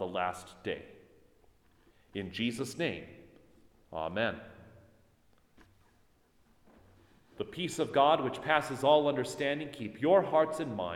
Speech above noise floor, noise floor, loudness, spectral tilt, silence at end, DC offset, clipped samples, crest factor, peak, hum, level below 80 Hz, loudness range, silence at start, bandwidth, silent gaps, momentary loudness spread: 37 dB; -68 dBFS; -31 LUFS; -5 dB/octave; 0 s; under 0.1%; under 0.1%; 24 dB; -10 dBFS; none; -66 dBFS; 13 LU; 0 s; 15 kHz; none; 17 LU